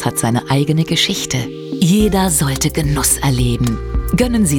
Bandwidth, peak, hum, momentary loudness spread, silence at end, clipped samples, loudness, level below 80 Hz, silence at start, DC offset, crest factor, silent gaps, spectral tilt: 19.5 kHz; -2 dBFS; none; 6 LU; 0 s; under 0.1%; -15 LUFS; -26 dBFS; 0 s; under 0.1%; 14 dB; none; -4.5 dB/octave